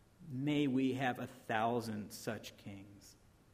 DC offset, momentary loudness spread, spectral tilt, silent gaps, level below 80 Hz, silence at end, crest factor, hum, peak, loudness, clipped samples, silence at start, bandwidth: under 0.1%; 18 LU; -6 dB/octave; none; -72 dBFS; 0.4 s; 20 dB; none; -20 dBFS; -38 LUFS; under 0.1%; 0.2 s; 15.5 kHz